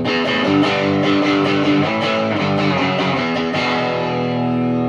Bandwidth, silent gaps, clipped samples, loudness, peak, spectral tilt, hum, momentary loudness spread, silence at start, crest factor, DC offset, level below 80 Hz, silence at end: 8.6 kHz; none; under 0.1%; -17 LUFS; -4 dBFS; -6 dB/octave; none; 4 LU; 0 s; 12 dB; under 0.1%; -54 dBFS; 0 s